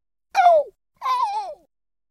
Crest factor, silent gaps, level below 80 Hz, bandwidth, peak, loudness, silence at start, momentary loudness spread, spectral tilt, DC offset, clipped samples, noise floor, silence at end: 18 dB; none; -70 dBFS; 13.5 kHz; -6 dBFS; -20 LUFS; 0.35 s; 17 LU; -0.5 dB/octave; under 0.1%; under 0.1%; -65 dBFS; 0.55 s